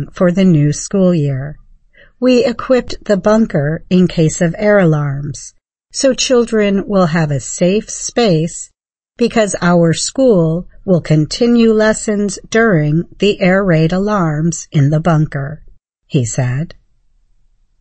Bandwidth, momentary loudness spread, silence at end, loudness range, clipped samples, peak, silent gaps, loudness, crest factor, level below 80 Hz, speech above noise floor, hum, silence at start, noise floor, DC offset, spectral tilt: 8.8 kHz; 9 LU; 1.1 s; 2 LU; under 0.1%; 0 dBFS; none; -13 LUFS; 12 dB; -38 dBFS; 41 dB; none; 0 s; -53 dBFS; under 0.1%; -6 dB/octave